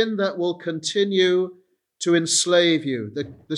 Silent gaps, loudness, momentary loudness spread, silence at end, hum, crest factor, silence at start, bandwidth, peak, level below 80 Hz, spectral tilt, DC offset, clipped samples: none; -21 LUFS; 11 LU; 0 s; none; 18 dB; 0 s; 12.5 kHz; -4 dBFS; -70 dBFS; -3.5 dB/octave; under 0.1%; under 0.1%